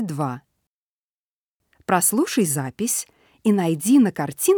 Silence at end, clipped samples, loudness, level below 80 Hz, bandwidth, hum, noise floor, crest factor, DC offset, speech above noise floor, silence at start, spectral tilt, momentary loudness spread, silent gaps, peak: 0 s; under 0.1%; -21 LUFS; -68 dBFS; over 20 kHz; none; under -90 dBFS; 18 dB; under 0.1%; over 70 dB; 0 s; -4.5 dB/octave; 11 LU; 0.67-1.60 s; -4 dBFS